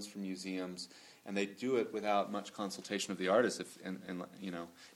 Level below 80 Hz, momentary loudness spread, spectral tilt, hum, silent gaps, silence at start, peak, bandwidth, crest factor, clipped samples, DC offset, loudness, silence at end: -80 dBFS; 13 LU; -4 dB/octave; none; none; 0 s; -18 dBFS; 17 kHz; 20 dB; under 0.1%; under 0.1%; -38 LUFS; 0 s